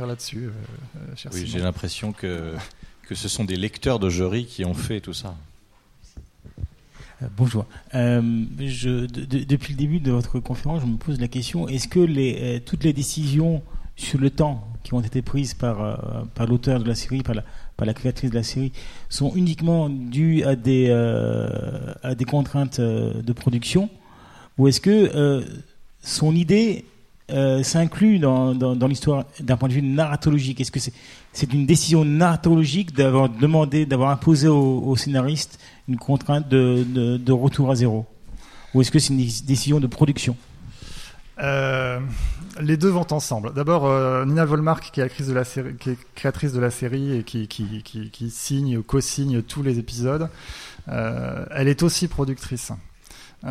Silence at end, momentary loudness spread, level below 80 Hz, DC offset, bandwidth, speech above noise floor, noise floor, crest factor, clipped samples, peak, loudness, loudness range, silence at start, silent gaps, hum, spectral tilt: 0 s; 14 LU; -40 dBFS; under 0.1%; 14.5 kHz; 32 dB; -53 dBFS; 18 dB; under 0.1%; -4 dBFS; -22 LUFS; 7 LU; 0 s; none; none; -6 dB/octave